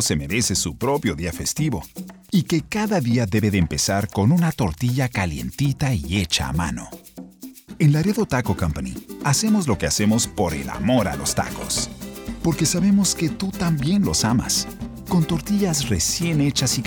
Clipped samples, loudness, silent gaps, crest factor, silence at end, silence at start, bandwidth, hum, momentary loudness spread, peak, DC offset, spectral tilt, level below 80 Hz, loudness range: under 0.1%; -21 LUFS; none; 14 dB; 0 s; 0 s; over 20 kHz; none; 11 LU; -6 dBFS; under 0.1%; -4.5 dB/octave; -40 dBFS; 2 LU